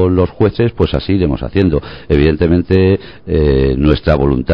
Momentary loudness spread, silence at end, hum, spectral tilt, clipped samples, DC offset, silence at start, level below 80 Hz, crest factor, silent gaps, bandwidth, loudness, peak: 5 LU; 0 s; none; -10 dB/octave; 0.3%; 1%; 0 s; -22 dBFS; 12 dB; none; 5.4 kHz; -13 LUFS; 0 dBFS